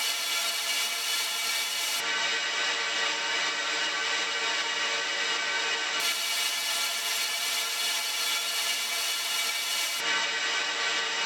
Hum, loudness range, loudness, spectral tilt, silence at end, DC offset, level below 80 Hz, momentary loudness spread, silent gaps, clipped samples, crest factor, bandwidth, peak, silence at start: none; 0 LU; -26 LUFS; 2.5 dB/octave; 0 s; under 0.1%; under -90 dBFS; 1 LU; none; under 0.1%; 14 dB; over 20 kHz; -14 dBFS; 0 s